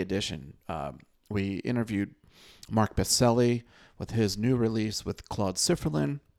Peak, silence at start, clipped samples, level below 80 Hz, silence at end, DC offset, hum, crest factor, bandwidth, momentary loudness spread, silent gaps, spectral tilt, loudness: -12 dBFS; 0 s; under 0.1%; -50 dBFS; 0.2 s; under 0.1%; none; 18 dB; 17 kHz; 13 LU; none; -5 dB/octave; -29 LUFS